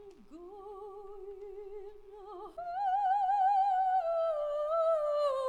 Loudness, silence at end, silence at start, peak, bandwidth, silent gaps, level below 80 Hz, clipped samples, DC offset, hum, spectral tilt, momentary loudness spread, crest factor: -31 LUFS; 0 s; 0 s; -22 dBFS; 9.8 kHz; none; -64 dBFS; under 0.1%; under 0.1%; none; -4 dB/octave; 21 LU; 12 dB